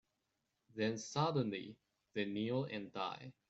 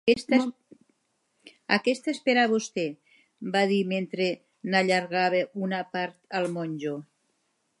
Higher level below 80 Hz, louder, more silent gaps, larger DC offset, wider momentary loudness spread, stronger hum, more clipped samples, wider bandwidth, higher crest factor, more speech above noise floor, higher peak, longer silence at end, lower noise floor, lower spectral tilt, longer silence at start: second, -80 dBFS vs -74 dBFS; second, -40 LUFS vs -27 LUFS; neither; neither; about the same, 11 LU vs 11 LU; neither; neither; second, 8.2 kHz vs 11.5 kHz; about the same, 20 dB vs 22 dB; about the same, 46 dB vs 48 dB; second, -22 dBFS vs -4 dBFS; second, 0.2 s vs 0.75 s; first, -86 dBFS vs -74 dBFS; about the same, -5.5 dB/octave vs -5 dB/octave; first, 0.75 s vs 0.05 s